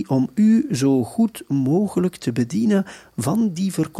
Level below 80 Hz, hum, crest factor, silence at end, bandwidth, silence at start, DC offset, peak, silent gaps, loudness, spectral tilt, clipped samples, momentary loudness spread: -60 dBFS; none; 12 dB; 0 s; 14 kHz; 0 s; under 0.1%; -8 dBFS; none; -20 LUFS; -7 dB/octave; under 0.1%; 6 LU